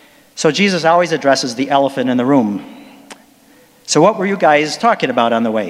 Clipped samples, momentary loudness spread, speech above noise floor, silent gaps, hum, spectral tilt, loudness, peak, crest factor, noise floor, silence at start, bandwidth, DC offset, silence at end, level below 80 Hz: under 0.1%; 5 LU; 34 dB; none; none; -4.5 dB/octave; -14 LUFS; 0 dBFS; 14 dB; -48 dBFS; 0.35 s; 15 kHz; under 0.1%; 0 s; -66 dBFS